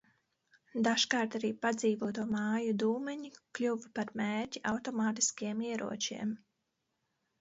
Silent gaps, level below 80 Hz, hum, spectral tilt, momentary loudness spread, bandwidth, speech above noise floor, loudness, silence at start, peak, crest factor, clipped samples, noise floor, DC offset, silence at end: none; -76 dBFS; none; -3 dB/octave; 9 LU; 8 kHz; 49 dB; -34 LUFS; 0.75 s; -12 dBFS; 22 dB; under 0.1%; -83 dBFS; under 0.1%; 1.05 s